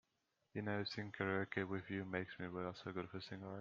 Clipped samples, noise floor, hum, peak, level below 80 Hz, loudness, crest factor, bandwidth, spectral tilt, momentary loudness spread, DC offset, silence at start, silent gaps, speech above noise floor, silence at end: under 0.1%; -85 dBFS; none; -24 dBFS; -80 dBFS; -45 LUFS; 22 dB; 7.2 kHz; -4.5 dB/octave; 8 LU; under 0.1%; 0.55 s; none; 41 dB; 0 s